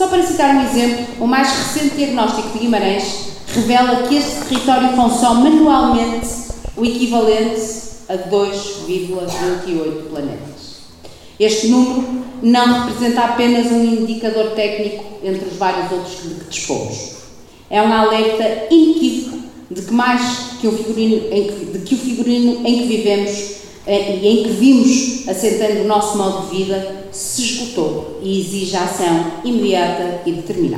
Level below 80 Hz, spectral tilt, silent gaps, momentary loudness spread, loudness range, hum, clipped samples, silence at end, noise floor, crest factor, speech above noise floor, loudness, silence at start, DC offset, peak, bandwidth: -42 dBFS; -4 dB/octave; none; 12 LU; 5 LU; none; under 0.1%; 0 s; -39 dBFS; 16 dB; 24 dB; -16 LUFS; 0 s; under 0.1%; 0 dBFS; 15.5 kHz